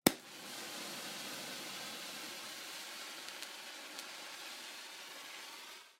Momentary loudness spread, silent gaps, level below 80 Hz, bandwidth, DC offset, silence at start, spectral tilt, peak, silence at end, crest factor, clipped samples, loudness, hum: 4 LU; none; -80 dBFS; 16 kHz; under 0.1%; 0.05 s; -2 dB/octave; -6 dBFS; 0.05 s; 38 dB; under 0.1%; -44 LUFS; none